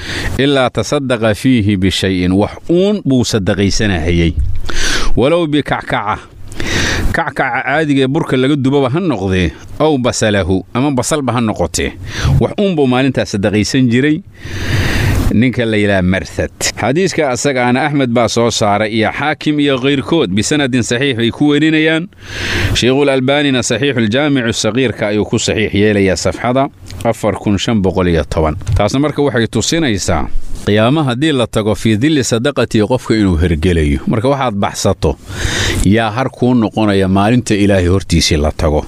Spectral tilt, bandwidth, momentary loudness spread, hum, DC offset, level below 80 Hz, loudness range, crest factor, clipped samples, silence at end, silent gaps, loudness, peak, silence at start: -5 dB/octave; 16 kHz; 5 LU; none; under 0.1%; -26 dBFS; 2 LU; 10 dB; under 0.1%; 0 s; none; -13 LUFS; -2 dBFS; 0 s